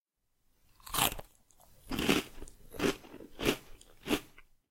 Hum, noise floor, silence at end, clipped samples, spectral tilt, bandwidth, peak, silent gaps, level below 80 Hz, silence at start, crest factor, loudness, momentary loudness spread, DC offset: none; -76 dBFS; 0.3 s; under 0.1%; -3 dB/octave; 16.5 kHz; -10 dBFS; none; -52 dBFS; 0.85 s; 26 dB; -34 LUFS; 18 LU; under 0.1%